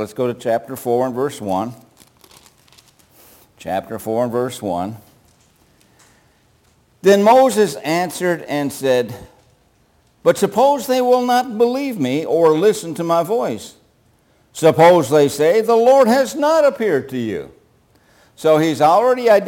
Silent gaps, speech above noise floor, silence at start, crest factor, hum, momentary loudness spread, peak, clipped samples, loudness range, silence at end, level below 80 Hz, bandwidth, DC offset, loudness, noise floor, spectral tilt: none; 41 dB; 0 s; 16 dB; none; 13 LU; -2 dBFS; under 0.1%; 11 LU; 0 s; -60 dBFS; 17 kHz; under 0.1%; -16 LUFS; -57 dBFS; -5 dB/octave